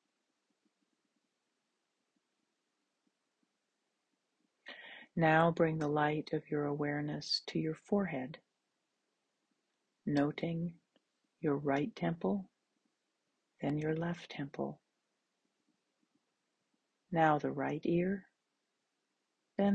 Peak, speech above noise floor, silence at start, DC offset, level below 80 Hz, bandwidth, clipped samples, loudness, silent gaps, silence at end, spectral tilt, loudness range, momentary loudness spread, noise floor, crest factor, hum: -14 dBFS; 51 dB; 4.65 s; under 0.1%; -74 dBFS; 8.8 kHz; under 0.1%; -35 LUFS; none; 0 s; -7 dB/octave; 8 LU; 13 LU; -85 dBFS; 24 dB; none